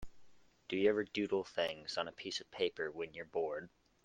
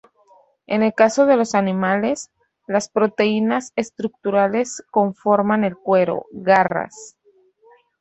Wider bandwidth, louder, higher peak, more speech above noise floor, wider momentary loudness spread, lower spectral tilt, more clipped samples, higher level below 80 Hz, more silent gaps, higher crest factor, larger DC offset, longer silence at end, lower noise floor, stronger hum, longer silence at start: first, 9.4 kHz vs 8.2 kHz; second, -38 LUFS vs -19 LUFS; second, -18 dBFS vs -2 dBFS; second, 24 dB vs 38 dB; about the same, 11 LU vs 10 LU; second, -4 dB/octave vs -5.5 dB/octave; neither; about the same, -66 dBFS vs -64 dBFS; neither; about the same, 20 dB vs 18 dB; neither; second, 0.35 s vs 0.9 s; first, -62 dBFS vs -56 dBFS; neither; second, 0 s vs 0.7 s